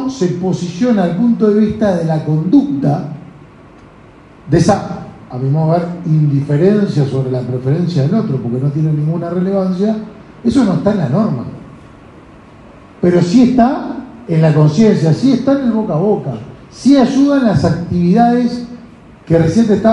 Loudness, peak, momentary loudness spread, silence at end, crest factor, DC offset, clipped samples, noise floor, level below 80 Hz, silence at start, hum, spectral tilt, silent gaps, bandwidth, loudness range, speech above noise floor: -13 LUFS; 0 dBFS; 11 LU; 0 s; 12 dB; under 0.1%; under 0.1%; -40 dBFS; -42 dBFS; 0 s; none; -8 dB/octave; none; 10.5 kHz; 5 LU; 28 dB